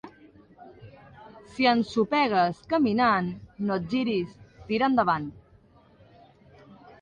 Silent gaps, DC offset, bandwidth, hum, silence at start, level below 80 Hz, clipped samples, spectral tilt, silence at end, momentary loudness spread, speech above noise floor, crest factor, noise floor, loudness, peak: none; under 0.1%; 9.4 kHz; none; 0.05 s; -60 dBFS; under 0.1%; -6.5 dB/octave; 0.1 s; 11 LU; 33 dB; 20 dB; -57 dBFS; -25 LUFS; -8 dBFS